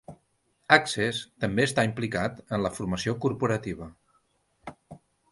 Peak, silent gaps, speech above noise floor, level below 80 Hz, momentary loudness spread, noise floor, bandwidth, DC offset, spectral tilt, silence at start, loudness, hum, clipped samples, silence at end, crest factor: -4 dBFS; none; 44 dB; -56 dBFS; 24 LU; -71 dBFS; 11.5 kHz; under 0.1%; -5 dB/octave; 0.1 s; -27 LUFS; none; under 0.1%; 0.35 s; 24 dB